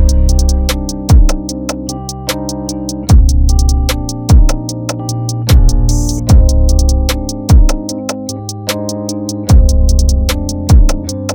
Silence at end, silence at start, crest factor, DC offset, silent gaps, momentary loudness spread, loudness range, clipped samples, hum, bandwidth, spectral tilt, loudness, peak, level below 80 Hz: 0 s; 0 s; 10 dB; under 0.1%; none; 10 LU; 2 LU; 0.8%; none; 19.5 kHz; -5.5 dB/octave; -13 LUFS; 0 dBFS; -12 dBFS